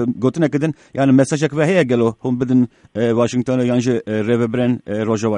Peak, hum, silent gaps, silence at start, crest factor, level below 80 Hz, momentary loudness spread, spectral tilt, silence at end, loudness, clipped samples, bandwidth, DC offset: -2 dBFS; none; none; 0 s; 16 dB; -56 dBFS; 6 LU; -7 dB/octave; 0 s; -17 LUFS; under 0.1%; 10.5 kHz; under 0.1%